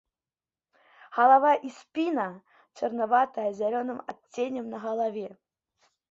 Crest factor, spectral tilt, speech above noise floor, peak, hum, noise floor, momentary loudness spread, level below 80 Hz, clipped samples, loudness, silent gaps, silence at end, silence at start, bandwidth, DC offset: 22 dB; -5.5 dB/octave; over 64 dB; -8 dBFS; none; under -90 dBFS; 16 LU; -78 dBFS; under 0.1%; -27 LUFS; none; 0.8 s; 1.1 s; 7.6 kHz; under 0.1%